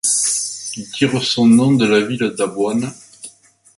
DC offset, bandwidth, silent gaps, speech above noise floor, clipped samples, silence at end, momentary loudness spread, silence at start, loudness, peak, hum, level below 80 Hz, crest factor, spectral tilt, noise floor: under 0.1%; 11.5 kHz; none; 30 dB; under 0.1%; 0.5 s; 21 LU; 0.05 s; -16 LUFS; -2 dBFS; none; -58 dBFS; 14 dB; -4 dB/octave; -45 dBFS